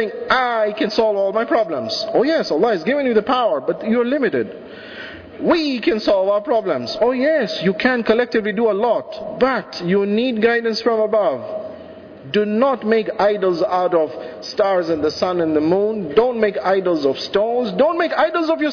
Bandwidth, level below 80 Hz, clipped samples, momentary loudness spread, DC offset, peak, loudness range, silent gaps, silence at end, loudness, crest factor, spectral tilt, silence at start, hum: 5.4 kHz; -54 dBFS; under 0.1%; 7 LU; under 0.1%; -4 dBFS; 2 LU; none; 0 s; -18 LUFS; 14 dB; -6 dB/octave; 0 s; none